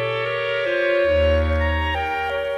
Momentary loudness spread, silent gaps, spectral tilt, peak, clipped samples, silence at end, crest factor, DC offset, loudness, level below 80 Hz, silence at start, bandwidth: 5 LU; none; -7 dB/octave; -8 dBFS; under 0.1%; 0 s; 12 dB; under 0.1%; -20 LUFS; -30 dBFS; 0 s; 7.2 kHz